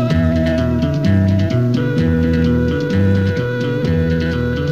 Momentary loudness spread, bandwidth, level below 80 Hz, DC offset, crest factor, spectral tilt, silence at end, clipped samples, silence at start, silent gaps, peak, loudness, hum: 3 LU; 7.4 kHz; -30 dBFS; 0.7%; 12 dB; -8.5 dB/octave; 0 s; under 0.1%; 0 s; none; -4 dBFS; -16 LUFS; none